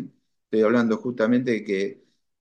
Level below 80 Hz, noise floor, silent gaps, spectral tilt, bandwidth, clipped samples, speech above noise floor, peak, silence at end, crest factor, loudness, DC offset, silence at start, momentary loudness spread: -72 dBFS; -43 dBFS; none; -7 dB/octave; 8.4 kHz; under 0.1%; 21 dB; -8 dBFS; 0.45 s; 16 dB; -23 LUFS; under 0.1%; 0 s; 9 LU